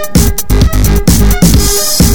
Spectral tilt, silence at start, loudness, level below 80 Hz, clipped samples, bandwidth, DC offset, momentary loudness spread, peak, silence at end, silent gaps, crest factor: -4.5 dB/octave; 0 s; -9 LUFS; -12 dBFS; 1%; 19 kHz; 10%; 3 LU; 0 dBFS; 0 s; none; 8 dB